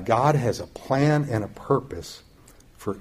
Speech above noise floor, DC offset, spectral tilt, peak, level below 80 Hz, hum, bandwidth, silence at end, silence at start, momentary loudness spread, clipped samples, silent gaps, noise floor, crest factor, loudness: 28 dB; under 0.1%; -7 dB/octave; -6 dBFS; -52 dBFS; none; 15 kHz; 0 s; 0 s; 16 LU; under 0.1%; none; -52 dBFS; 18 dB; -24 LUFS